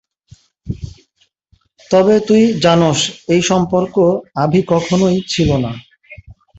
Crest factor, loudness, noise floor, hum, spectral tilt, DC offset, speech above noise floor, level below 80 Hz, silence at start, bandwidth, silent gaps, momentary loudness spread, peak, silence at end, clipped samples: 14 dB; -14 LUFS; -60 dBFS; none; -5.5 dB/octave; under 0.1%; 47 dB; -40 dBFS; 0.65 s; 8.2 kHz; none; 16 LU; -2 dBFS; 0.25 s; under 0.1%